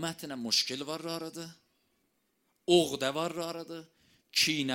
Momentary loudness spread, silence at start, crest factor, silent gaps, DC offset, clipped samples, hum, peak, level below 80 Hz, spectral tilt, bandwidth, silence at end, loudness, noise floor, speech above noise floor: 18 LU; 0 s; 22 dB; none; under 0.1%; under 0.1%; none; -12 dBFS; -72 dBFS; -3 dB/octave; 16.5 kHz; 0 s; -30 LUFS; -76 dBFS; 44 dB